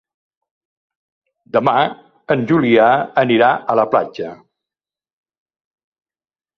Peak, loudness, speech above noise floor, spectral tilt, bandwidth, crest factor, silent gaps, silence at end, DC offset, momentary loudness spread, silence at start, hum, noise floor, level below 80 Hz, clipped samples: -2 dBFS; -15 LUFS; over 75 dB; -8 dB/octave; 6.4 kHz; 18 dB; none; 2.25 s; under 0.1%; 9 LU; 1.55 s; none; under -90 dBFS; -60 dBFS; under 0.1%